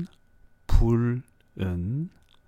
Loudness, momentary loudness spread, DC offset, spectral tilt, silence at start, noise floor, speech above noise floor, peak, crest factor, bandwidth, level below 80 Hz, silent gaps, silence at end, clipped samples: -28 LUFS; 15 LU; under 0.1%; -8.5 dB/octave; 0 s; -57 dBFS; 31 dB; -6 dBFS; 20 dB; 8.6 kHz; -30 dBFS; none; 0.4 s; under 0.1%